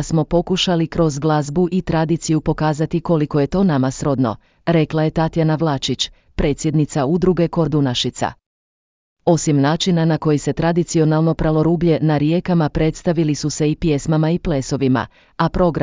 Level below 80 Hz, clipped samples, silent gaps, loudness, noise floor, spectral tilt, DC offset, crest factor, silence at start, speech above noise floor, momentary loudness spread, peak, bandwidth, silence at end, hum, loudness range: -36 dBFS; under 0.1%; 8.46-9.16 s; -18 LUFS; under -90 dBFS; -6 dB/octave; under 0.1%; 14 dB; 0 s; over 73 dB; 5 LU; -4 dBFS; 7.6 kHz; 0 s; none; 2 LU